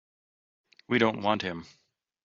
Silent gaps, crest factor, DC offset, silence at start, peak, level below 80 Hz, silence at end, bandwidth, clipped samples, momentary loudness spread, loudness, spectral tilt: none; 24 dB; under 0.1%; 0.9 s; -8 dBFS; -68 dBFS; 0.6 s; 7.4 kHz; under 0.1%; 11 LU; -28 LUFS; -3.5 dB/octave